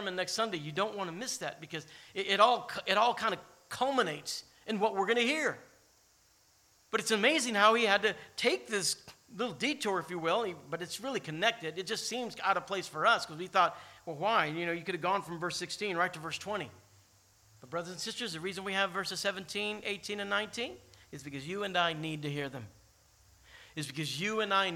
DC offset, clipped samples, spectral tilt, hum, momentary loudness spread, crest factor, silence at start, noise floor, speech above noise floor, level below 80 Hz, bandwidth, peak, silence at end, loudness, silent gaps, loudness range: under 0.1%; under 0.1%; -3 dB/octave; none; 13 LU; 24 dB; 0 s; -67 dBFS; 34 dB; -74 dBFS; 17 kHz; -10 dBFS; 0 s; -32 LUFS; none; 7 LU